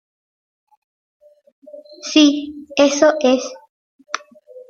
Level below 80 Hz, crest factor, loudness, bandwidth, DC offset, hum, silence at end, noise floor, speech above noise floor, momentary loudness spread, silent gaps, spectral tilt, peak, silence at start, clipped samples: -64 dBFS; 20 dB; -15 LUFS; 7.8 kHz; under 0.1%; none; 0.1 s; -42 dBFS; 27 dB; 16 LU; 3.69-3.99 s; -2 dB/octave; 0 dBFS; 1.75 s; under 0.1%